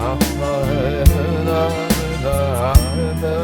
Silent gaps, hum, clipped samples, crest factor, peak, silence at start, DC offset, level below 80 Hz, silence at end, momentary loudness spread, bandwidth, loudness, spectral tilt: none; none; under 0.1%; 16 dB; 0 dBFS; 0 s; under 0.1%; -22 dBFS; 0 s; 5 LU; 18.5 kHz; -18 LUFS; -6 dB/octave